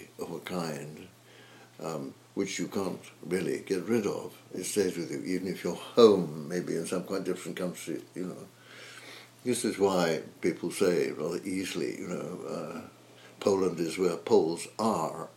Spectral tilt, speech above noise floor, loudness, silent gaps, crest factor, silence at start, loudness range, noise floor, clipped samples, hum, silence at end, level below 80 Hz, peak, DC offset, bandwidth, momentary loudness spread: -5 dB/octave; 24 dB; -31 LUFS; none; 24 dB; 0 s; 7 LU; -54 dBFS; under 0.1%; none; 0.05 s; -76 dBFS; -6 dBFS; under 0.1%; 16 kHz; 15 LU